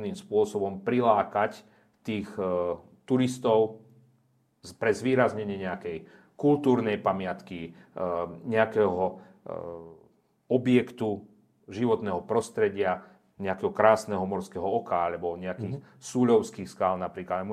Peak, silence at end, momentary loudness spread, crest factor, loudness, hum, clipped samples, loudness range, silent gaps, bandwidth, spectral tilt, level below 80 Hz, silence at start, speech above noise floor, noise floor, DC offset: -4 dBFS; 0 s; 15 LU; 24 dB; -28 LUFS; none; under 0.1%; 3 LU; none; 13.5 kHz; -6.5 dB/octave; -70 dBFS; 0 s; 41 dB; -68 dBFS; under 0.1%